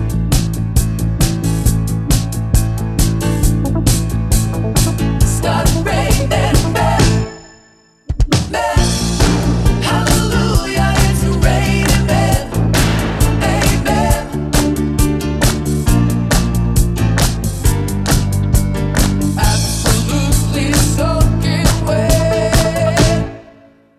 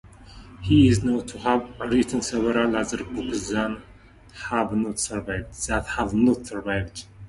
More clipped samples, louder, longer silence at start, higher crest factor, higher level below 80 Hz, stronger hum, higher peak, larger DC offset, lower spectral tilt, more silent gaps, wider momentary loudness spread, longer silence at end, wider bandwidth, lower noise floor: neither; first, -15 LUFS vs -24 LUFS; about the same, 0 s vs 0.05 s; second, 14 dB vs 20 dB; first, -18 dBFS vs -42 dBFS; neither; first, 0 dBFS vs -4 dBFS; neither; about the same, -5 dB/octave vs -5.5 dB/octave; neither; second, 3 LU vs 11 LU; first, 0.55 s vs 0 s; first, 14.5 kHz vs 11.5 kHz; about the same, -48 dBFS vs -48 dBFS